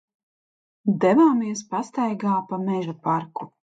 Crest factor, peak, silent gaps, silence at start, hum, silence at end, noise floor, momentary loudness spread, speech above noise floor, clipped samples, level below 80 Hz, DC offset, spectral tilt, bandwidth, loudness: 16 dB; -6 dBFS; none; 0.85 s; none; 0.3 s; under -90 dBFS; 11 LU; over 68 dB; under 0.1%; -74 dBFS; under 0.1%; -7 dB/octave; 9 kHz; -23 LUFS